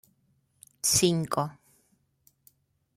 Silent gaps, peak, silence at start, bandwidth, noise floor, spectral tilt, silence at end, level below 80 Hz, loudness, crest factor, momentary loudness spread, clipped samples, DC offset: none; -10 dBFS; 0.85 s; 16.5 kHz; -70 dBFS; -3.5 dB/octave; 1.45 s; -62 dBFS; -26 LUFS; 22 dB; 10 LU; under 0.1%; under 0.1%